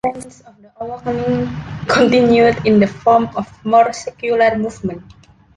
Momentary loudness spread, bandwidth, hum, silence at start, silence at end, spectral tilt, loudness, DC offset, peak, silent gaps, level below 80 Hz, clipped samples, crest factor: 15 LU; 11.5 kHz; none; 0.05 s; 0.55 s; -6 dB/octave; -15 LUFS; under 0.1%; -2 dBFS; none; -46 dBFS; under 0.1%; 14 dB